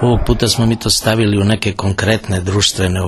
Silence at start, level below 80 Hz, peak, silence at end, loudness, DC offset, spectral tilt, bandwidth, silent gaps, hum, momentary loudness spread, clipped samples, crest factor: 0 s; -28 dBFS; 0 dBFS; 0 s; -14 LUFS; under 0.1%; -4.5 dB/octave; 13 kHz; none; none; 4 LU; under 0.1%; 14 dB